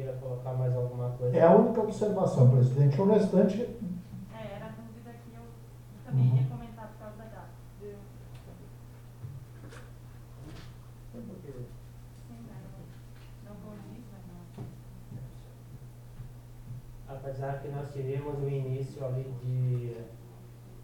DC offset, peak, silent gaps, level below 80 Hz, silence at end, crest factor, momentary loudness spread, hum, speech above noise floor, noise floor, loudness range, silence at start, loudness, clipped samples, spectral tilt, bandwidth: under 0.1%; -8 dBFS; none; -54 dBFS; 0 s; 24 dB; 26 LU; none; 22 dB; -49 dBFS; 22 LU; 0 s; -28 LUFS; under 0.1%; -9 dB/octave; 9.8 kHz